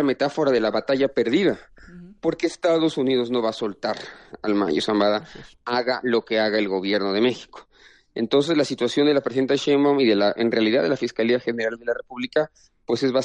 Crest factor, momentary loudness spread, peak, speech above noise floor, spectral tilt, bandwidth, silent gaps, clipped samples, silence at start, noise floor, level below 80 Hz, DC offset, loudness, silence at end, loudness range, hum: 14 dB; 9 LU; -8 dBFS; 23 dB; -5.5 dB/octave; 10 kHz; none; under 0.1%; 0 s; -44 dBFS; -60 dBFS; under 0.1%; -22 LUFS; 0 s; 4 LU; none